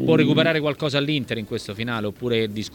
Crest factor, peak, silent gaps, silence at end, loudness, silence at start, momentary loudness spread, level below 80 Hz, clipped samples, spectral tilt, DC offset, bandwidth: 18 dB; -4 dBFS; none; 0 s; -22 LUFS; 0 s; 10 LU; -54 dBFS; under 0.1%; -6 dB/octave; under 0.1%; 18 kHz